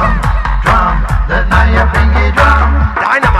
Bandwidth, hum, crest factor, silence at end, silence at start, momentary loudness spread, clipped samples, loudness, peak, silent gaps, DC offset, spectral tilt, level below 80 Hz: 11 kHz; none; 10 dB; 0 s; 0 s; 5 LU; under 0.1%; -11 LUFS; 0 dBFS; none; under 0.1%; -6.5 dB/octave; -12 dBFS